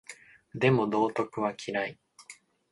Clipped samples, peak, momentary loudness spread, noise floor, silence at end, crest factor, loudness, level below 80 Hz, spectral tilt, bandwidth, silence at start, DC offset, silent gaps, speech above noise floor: under 0.1%; -12 dBFS; 24 LU; -54 dBFS; 0.4 s; 20 dB; -29 LUFS; -68 dBFS; -6.5 dB/octave; 11.5 kHz; 0.1 s; under 0.1%; none; 26 dB